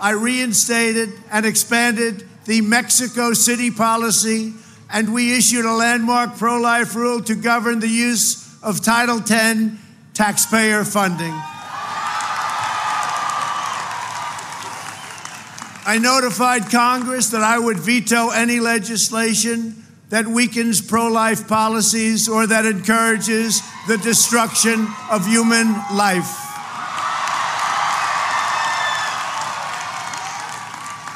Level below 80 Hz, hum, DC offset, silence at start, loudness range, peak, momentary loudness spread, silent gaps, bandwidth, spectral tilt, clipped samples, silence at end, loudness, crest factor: -66 dBFS; none; under 0.1%; 0 s; 5 LU; -2 dBFS; 12 LU; none; 16 kHz; -2.5 dB/octave; under 0.1%; 0 s; -17 LUFS; 16 dB